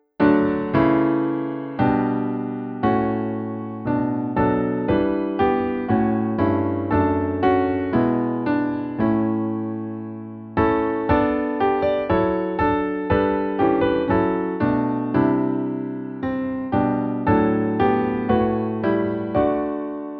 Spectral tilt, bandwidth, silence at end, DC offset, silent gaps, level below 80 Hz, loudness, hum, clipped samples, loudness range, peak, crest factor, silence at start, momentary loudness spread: -10.5 dB/octave; 5 kHz; 0 s; under 0.1%; none; -44 dBFS; -21 LUFS; none; under 0.1%; 2 LU; -4 dBFS; 16 dB; 0.2 s; 7 LU